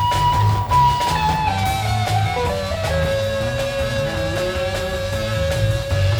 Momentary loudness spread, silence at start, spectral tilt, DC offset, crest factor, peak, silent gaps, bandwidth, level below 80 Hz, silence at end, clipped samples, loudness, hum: 6 LU; 0 s; -5 dB/octave; under 0.1%; 14 dB; -6 dBFS; none; over 20 kHz; -30 dBFS; 0 s; under 0.1%; -20 LUFS; none